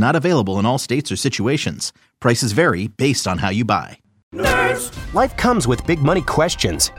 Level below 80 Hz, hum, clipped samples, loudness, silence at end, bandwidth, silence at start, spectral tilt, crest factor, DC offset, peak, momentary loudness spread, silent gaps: -36 dBFS; none; under 0.1%; -18 LUFS; 0 s; 16.5 kHz; 0 s; -4.5 dB/octave; 16 dB; under 0.1%; -2 dBFS; 6 LU; 4.23-4.31 s